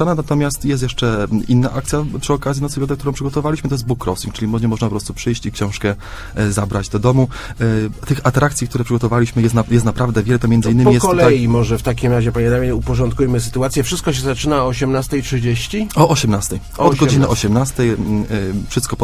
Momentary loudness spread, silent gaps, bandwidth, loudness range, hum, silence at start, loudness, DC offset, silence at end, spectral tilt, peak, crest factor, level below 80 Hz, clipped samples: 8 LU; none; 16 kHz; 6 LU; none; 0 s; -16 LUFS; under 0.1%; 0 s; -6 dB/octave; 0 dBFS; 16 dB; -30 dBFS; under 0.1%